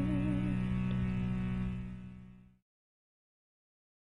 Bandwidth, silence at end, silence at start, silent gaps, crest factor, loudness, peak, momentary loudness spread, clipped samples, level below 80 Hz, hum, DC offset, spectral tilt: 9.6 kHz; 1.55 s; 0 s; none; 14 dB; -35 LUFS; -22 dBFS; 15 LU; under 0.1%; -48 dBFS; none; 0.3%; -9 dB/octave